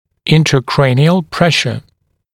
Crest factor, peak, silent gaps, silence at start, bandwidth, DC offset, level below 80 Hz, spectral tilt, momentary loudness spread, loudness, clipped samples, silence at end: 14 dB; 0 dBFS; none; 0.25 s; 13.5 kHz; under 0.1%; -44 dBFS; -5.5 dB/octave; 6 LU; -12 LUFS; under 0.1%; 0.55 s